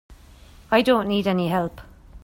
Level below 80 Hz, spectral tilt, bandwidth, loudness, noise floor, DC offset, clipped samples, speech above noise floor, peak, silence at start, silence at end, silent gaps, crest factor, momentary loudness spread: -48 dBFS; -6.5 dB/octave; 16.5 kHz; -22 LUFS; -47 dBFS; under 0.1%; under 0.1%; 27 dB; -4 dBFS; 0.1 s; 0.05 s; none; 18 dB; 7 LU